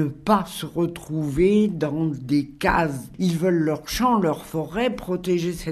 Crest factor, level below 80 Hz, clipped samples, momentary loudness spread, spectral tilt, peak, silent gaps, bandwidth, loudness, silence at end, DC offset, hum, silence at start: 18 dB; -44 dBFS; under 0.1%; 7 LU; -6 dB/octave; -4 dBFS; none; 13.5 kHz; -23 LUFS; 0 s; under 0.1%; none; 0 s